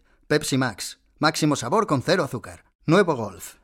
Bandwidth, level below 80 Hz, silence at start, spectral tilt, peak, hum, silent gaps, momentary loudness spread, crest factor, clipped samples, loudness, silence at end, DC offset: 16.5 kHz; -56 dBFS; 0.3 s; -5 dB/octave; -4 dBFS; none; 2.75-2.79 s; 14 LU; 20 dB; under 0.1%; -23 LUFS; 0.1 s; under 0.1%